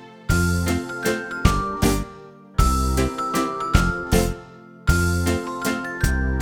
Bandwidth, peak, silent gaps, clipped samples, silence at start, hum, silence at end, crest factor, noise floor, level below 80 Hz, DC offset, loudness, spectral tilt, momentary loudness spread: over 20 kHz; -2 dBFS; none; under 0.1%; 0 s; none; 0 s; 20 dB; -42 dBFS; -26 dBFS; under 0.1%; -22 LUFS; -5.5 dB/octave; 5 LU